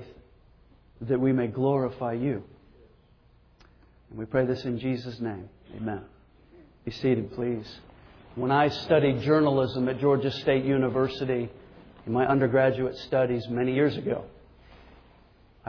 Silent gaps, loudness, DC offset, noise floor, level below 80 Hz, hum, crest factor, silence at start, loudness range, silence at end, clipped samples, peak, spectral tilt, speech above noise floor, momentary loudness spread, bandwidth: none; -26 LUFS; under 0.1%; -59 dBFS; -56 dBFS; none; 18 dB; 0 s; 8 LU; 0 s; under 0.1%; -10 dBFS; -8.5 dB/octave; 33 dB; 16 LU; 5.4 kHz